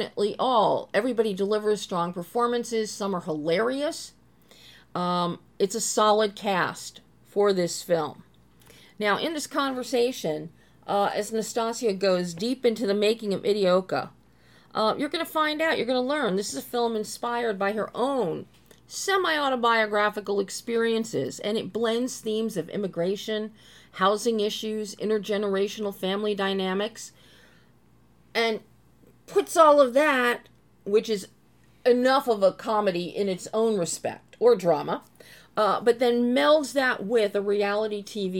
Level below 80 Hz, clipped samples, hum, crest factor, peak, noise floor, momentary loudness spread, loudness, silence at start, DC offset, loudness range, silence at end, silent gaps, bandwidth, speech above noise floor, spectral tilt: -68 dBFS; under 0.1%; none; 20 dB; -4 dBFS; -60 dBFS; 10 LU; -25 LUFS; 0 s; under 0.1%; 5 LU; 0 s; none; 17.5 kHz; 35 dB; -4 dB/octave